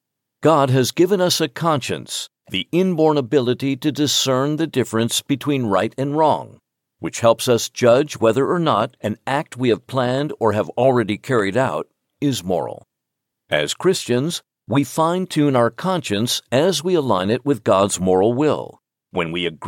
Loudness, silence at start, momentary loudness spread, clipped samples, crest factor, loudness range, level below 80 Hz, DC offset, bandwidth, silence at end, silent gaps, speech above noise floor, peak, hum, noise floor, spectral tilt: -19 LUFS; 0.4 s; 8 LU; under 0.1%; 18 dB; 3 LU; -62 dBFS; under 0.1%; 17 kHz; 0 s; none; 62 dB; 0 dBFS; none; -80 dBFS; -5 dB/octave